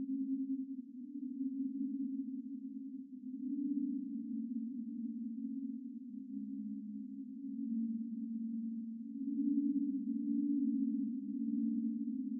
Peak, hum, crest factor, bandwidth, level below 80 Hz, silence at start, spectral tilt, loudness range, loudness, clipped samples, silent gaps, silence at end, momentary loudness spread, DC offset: -24 dBFS; none; 14 dB; 0.5 kHz; under -90 dBFS; 0 s; -8 dB/octave; 6 LU; -40 LUFS; under 0.1%; none; 0 s; 11 LU; under 0.1%